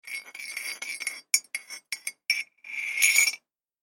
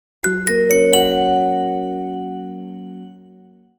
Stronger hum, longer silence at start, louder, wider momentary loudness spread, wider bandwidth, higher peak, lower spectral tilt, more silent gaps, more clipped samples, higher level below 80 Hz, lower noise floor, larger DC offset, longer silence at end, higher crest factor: neither; second, 0.05 s vs 0.25 s; second, -26 LUFS vs -17 LUFS; about the same, 17 LU vs 19 LU; second, 17 kHz vs over 20 kHz; about the same, -4 dBFS vs -2 dBFS; second, 5 dB/octave vs -3.5 dB/octave; neither; neither; second, under -90 dBFS vs -48 dBFS; about the same, -48 dBFS vs -47 dBFS; neither; second, 0.45 s vs 0.65 s; first, 26 dB vs 18 dB